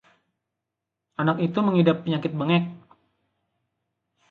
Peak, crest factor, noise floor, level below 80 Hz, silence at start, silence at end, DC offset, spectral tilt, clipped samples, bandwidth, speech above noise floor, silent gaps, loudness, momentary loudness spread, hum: -8 dBFS; 20 dB; -85 dBFS; -70 dBFS; 1.2 s; 1.55 s; under 0.1%; -9 dB/octave; under 0.1%; 4.6 kHz; 62 dB; none; -23 LUFS; 9 LU; none